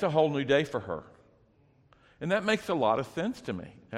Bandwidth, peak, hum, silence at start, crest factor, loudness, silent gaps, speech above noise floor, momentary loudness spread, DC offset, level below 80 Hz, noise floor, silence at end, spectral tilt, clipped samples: 15 kHz; -12 dBFS; none; 0 s; 18 dB; -30 LUFS; none; 35 dB; 13 LU; under 0.1%; -64 dBFS; -64 dBFS; 0 s; -6 dB/octave; under 0.1%